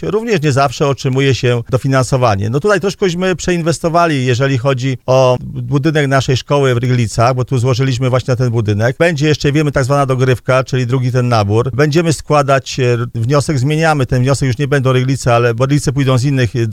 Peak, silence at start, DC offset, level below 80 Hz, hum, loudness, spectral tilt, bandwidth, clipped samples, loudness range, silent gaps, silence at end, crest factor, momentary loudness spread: 0 dBFS; 0 s; under 0.1%; -38 dBFS; none; -13 LUFS; -6 dB/octave; 13 kHz; under 0.1%; 1 LU; none; 0 s; 12 dB; 3 LU